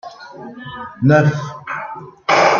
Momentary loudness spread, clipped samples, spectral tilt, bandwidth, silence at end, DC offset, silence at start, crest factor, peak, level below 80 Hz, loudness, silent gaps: 21 LU; under 0.1%; -6 dB/octave; 7.4 kHz; 0 s; under 0.1%; 0.05 s; 16 dB; -2 dBFS; -58 dBFS; -17 LUFS; none